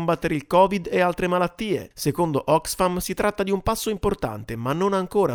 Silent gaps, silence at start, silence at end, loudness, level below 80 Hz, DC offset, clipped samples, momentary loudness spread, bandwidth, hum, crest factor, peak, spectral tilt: none; 0 s; 0 s; -23 LUFS; -42 dBFS; under 0.1%; under 0.1%; 8 LU; over 20 kHz; none; 18 dB; -4 dBFS; -5.5 dB/octave